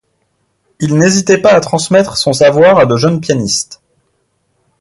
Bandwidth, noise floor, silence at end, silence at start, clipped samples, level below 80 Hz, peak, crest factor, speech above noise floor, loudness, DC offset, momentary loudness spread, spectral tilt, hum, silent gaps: 11.5 kHz; -62 dBFS; 1.05 s; 0.8 s; under 0.1%; -48 dBFS; 0 dBFS; 12 dB; 52 dB; -10 LUFS; under 0.1%; 8 LU; -4.5 dB/octave; none; none